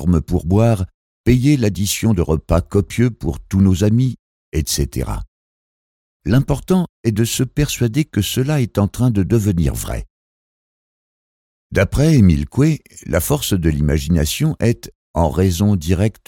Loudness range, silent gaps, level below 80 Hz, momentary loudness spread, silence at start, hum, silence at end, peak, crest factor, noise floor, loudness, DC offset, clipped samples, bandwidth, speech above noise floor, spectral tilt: 4 LU; 0.94-1.24 s, 4.19-4.52 s, 5.28-6.20 s, 6.89-7.04 s, 10.10-11.70 s, 14.95-15.14 s; -30 dBFS; 10 LU; 0 s; none; 0.15 s; -2 dBFS; 14 dB; under -90 dBFS; -17 LUFS; under 0.1%; under 0.1%; 17.5 kHz; over 74 dB; -6 dB/octave